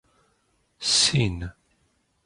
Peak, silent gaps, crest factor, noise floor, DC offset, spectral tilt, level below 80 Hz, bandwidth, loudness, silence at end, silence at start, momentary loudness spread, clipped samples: -8 dBFS; none; 20 dB; -69 dBFS; under 0.1%; -2.5 dB/octave; -46 dBFS; 11.5 kHz; -21 LUFS; 0.75 s; 0.8 s; 18 LU; under 0.1%